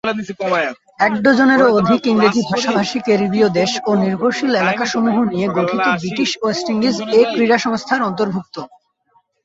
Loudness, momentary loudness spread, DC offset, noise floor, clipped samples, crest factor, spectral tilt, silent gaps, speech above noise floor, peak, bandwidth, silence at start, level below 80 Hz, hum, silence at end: -16 LUFS; 7 LU; under 0.1%; -60 dBFS; under 0.1%; 16 dB; -5 dB/octave; none; 44 dB; 0 dBFS; 8 kHz; 0.05 s; -56 dBFS; none; 0.8 s